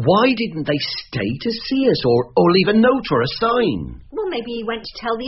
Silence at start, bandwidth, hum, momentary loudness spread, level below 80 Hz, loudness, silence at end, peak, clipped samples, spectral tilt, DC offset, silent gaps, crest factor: 0 s; 6 kHz; none; 11 LU; -46 dBFS; -18 LUFS; 0 s; -2 dBFS; under 0.1%; -4.5 dB/octave; under 0.1%; none; 16 dB